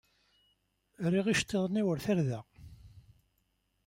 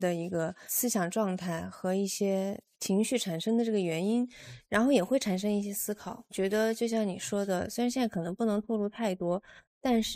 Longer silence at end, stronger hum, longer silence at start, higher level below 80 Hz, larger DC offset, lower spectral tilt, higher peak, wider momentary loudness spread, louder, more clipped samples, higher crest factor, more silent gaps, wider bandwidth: first, 0.85 s vs 0 s; first, 50 Hz at -60 dBFS vs none; first, 1 s vs 0 s; about the same, -62 dBFS vs -64 dBFS; neither; about the same, -5.5 dB/octave vs -4.5 dB/octave; second, -18 dBFS vs -12 dBFS; about the same, 7 LU vs 7 LU; about the same, -32 LUFS vs -31 LUFS; neither; about the same, 16 dB vs 18 dB; second, none vs 9.67-9.81 s; about the same, 16 kHz vs 15.5 kHz